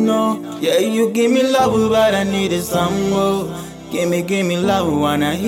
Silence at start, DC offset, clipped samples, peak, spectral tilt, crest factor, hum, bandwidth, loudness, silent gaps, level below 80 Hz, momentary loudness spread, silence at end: 0 s; under 0.1%; under 0.1%; -4 dBFS; -5 dB/octave; 12 dB; none; 17 kHz; -17 LUFS; none; -46 dBFS; 7 LU; 0 s